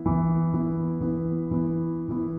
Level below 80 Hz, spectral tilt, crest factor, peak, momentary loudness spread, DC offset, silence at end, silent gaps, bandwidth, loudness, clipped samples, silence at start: -44 dBFS; -14 dB/octave; 14 dB; -12 dBFS; 5 LU; under 0.1%; 0 s; none; 2.3 kHz; -26 LUFS; under 0.1%; 0 s